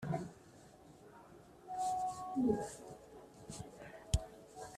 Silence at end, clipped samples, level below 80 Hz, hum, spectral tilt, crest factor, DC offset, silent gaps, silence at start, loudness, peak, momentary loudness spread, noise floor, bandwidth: 0 s; under 0.1%; -52 dBFS; none; -6 dB/octave; 24 dB; under 0.1%; none; 0 s; -41 LUFS; -18 dBFS; 23 LU; -60 dBFS; 14 kHz